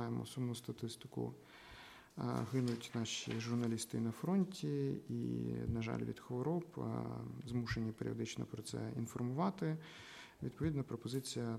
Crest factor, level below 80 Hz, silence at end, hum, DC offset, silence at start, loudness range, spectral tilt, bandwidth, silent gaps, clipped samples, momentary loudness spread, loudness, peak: 16 dB; -64 dBFS; 0 s; none; under 0.1%; 0 s; 3 LU; -6 dB/octave; 15.5 kHz; none; under 0.1%; 9 LU; -42 LUFS; -24 dBFS